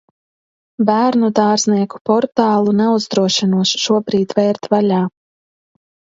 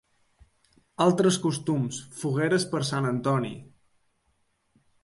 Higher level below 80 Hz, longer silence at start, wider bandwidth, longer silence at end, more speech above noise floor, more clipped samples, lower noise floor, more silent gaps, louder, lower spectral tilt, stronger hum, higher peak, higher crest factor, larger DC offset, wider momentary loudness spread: about the same, -62 dBFS vs -66 dBFS; second, 0.8 s vs 1 s; second, 7.8 kHz vs 11.5 kHz; second, 1.05 s vs 1.35 s; first, over 76 dB vs 46 dB; neither; first, under -90 dBFS vs -71 dBFS; first, 2.01-2.05 s vs none; first, -15 LUFS vs -26 LUFS; about the same, -5 dB/octave vs -5.5 dB/octave; neither; first, 0 dBFS vs -8 dBFS; about the same, 16 dB vs 20 dB; neither; second, 3 LU vs 11 LU